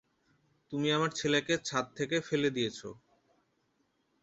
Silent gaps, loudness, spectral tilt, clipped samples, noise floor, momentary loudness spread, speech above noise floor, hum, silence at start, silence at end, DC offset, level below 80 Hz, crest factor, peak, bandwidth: none; -32 LUFS; -4 dB/octave; under 0.1%; -76 dBFS; 10 LU; 44 dB; none; 0.7 s; 1.25 s; under 0.1%; -70 dBFS; 20 dB; -14 dBFS; 8.2 kHz